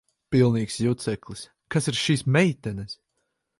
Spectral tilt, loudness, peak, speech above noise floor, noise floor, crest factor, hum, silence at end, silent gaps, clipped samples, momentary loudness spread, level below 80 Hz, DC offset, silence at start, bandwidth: -5.5 dB/octave; -24 LUFS; -6 dBFS; 53 dB; -76 dBFS; 20 dB; none; 0.65 s; none; under 0.1%; 18 LU; -54 dBFS; under 0.1%; 0.3 s; 11.5 kHz